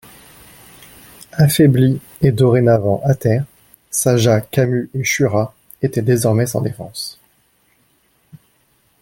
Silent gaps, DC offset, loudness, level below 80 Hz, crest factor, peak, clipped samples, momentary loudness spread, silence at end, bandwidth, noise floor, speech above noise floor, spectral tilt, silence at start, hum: none; under 0.1%; -16 LUFS; -50 dBFS; 16 dB; -2 dBFS; under 0.1%; 14 LU; 0.65 s; 17 kHz; -59 dBFS; 44 dB; -6 dB/octave; 1.35 s; none